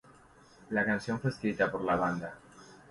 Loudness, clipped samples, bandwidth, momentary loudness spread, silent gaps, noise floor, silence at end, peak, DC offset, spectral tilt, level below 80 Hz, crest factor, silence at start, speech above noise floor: -32 LUFS; under 0.1%; 11.5 kHz; 10 LU; none; -59 dBFS; 0.1 s; -14 dBFS; under 0.1%; -7 dB/octave; -62 dBFS; 18 dB; 0.7 s; 27 dB